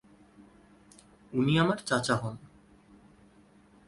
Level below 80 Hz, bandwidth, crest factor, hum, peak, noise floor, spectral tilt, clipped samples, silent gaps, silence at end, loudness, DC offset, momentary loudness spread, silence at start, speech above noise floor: -62 dBFS; 11.5 kHz; 20 dB; none; -12 dBFS; -59 dBFS; -5.5 dB/octave; under 0.1%; none; 1.4 s; -29 LUFS; under 0.1%; 14 LU; 1.3 s; 32 dB